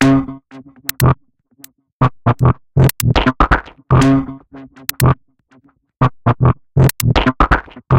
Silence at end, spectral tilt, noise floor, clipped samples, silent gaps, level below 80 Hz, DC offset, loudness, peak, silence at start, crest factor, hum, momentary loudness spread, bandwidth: 0 s; -6 dB/octave; -52 dBFS; under 0.1%; 1.92-2.00 s; -26 dBFS; under 0.1%; -15 LUFS; 0 dBFS; 0 s; 14 dB; none; 12 LU; 17 kHz